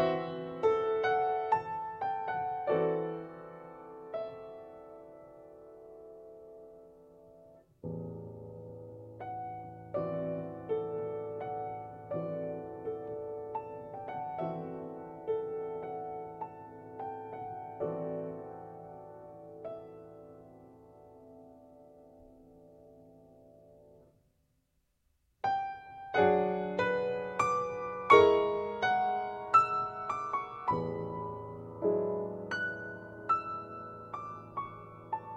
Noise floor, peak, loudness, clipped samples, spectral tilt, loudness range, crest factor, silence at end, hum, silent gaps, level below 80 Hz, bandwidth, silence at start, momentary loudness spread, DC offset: -76 dBFS; -8 dBFS; -34 LUFS; under 0.1%; -6.5 dB/octave; 20 LU; 28 dB; 0 s; none; none; -68 dBFS; 9.2 kHz; 0 s; 20 LU; under 0.1%